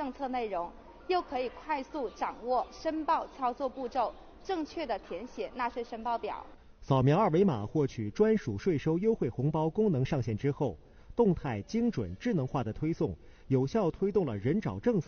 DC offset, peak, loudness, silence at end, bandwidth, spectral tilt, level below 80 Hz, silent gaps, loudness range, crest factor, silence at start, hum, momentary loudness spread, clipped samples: under 0.1%; -14 dBFS; -32 LUFS; 0.05 s; 6.8 kHz; -7 dB/octave; -54 dBFS; none; 6 LU; 18 dB; 0 s; none; 9 LU; under 0.1%